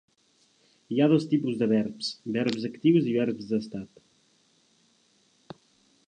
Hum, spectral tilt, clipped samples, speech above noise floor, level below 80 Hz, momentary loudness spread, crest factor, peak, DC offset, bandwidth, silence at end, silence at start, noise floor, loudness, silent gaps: none; -7 dB/octave; under 0.1%; 40 dB; -72 dBFS; 11 LU; 18 dB; -10 dBFS; under 0.1%; 9.4 kHz; 2.2 s; 0.9 s; -66 dBFS; -26 LUFS; none